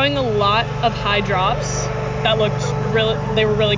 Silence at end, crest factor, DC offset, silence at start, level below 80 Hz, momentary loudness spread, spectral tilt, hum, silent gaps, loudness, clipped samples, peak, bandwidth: 0 s; 14 dB; under 0.1%; 0 s; -34 dBFS; 5 LU; -5 dB/octave; none; none; -18 LUFS; under 0.1%; -4 dBFS; 7.6 kHz